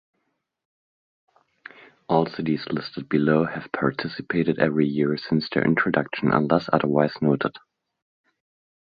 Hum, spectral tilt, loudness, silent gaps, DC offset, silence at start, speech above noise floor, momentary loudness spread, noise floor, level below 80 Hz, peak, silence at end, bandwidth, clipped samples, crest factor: none; -9 dB/octave; -23 LUFS; none; under 0.1%; 2.1 s; 53 dB; 6 LU; -76 dBFS; -60 dBFS; -4 dBFS; 1.25 s; 5.2 kHz; under 0.1%; 22 dB